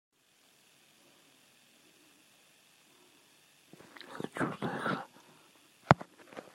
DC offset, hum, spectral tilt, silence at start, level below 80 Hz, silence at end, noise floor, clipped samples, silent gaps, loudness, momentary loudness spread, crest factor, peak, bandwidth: under 0.1%; none; -6.5 dB/octave; 4.05 s; -68 dBFS; 0.15 s; -67 dBFS; under 0.1%; none; -33 LUFS; 28 LU; 38 dB; -2 dBFS; 16 kHz